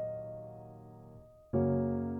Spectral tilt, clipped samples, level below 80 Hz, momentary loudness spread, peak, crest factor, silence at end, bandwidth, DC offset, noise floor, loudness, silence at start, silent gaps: -12.5 dB/octave; under 0.1%; -62 dBFS; 23 LU; -20 dBFS; 16 dB; 0 s; 2.4 kHz; under 0.1%; -55 dBFS; -34 LUFS; 0 s; none